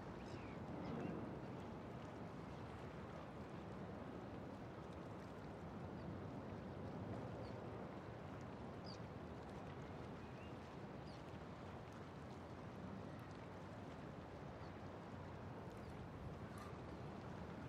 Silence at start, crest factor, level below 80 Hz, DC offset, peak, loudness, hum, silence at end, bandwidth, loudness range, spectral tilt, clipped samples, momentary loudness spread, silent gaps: 0 s; 16 dB; -66 dBFS; under 0.1%; -36 dBFS; -53 LUFS; none; 0 s; 14.5 kHz; 2 LU; -7.5 dB/octave; under 0.1%; 4 LU; none